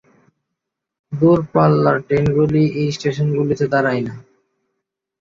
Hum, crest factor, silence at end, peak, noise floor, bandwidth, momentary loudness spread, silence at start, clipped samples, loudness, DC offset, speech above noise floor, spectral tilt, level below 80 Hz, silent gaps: none; 16 dB; 1 s; -2 dBFS; -80 dBFS; 7.4 kHz; 6 LU; 1.1 s; under 0.1%; -17 LUFS; under 0.1%; 64 dB; -8 dB/octave; -48 dBFS; none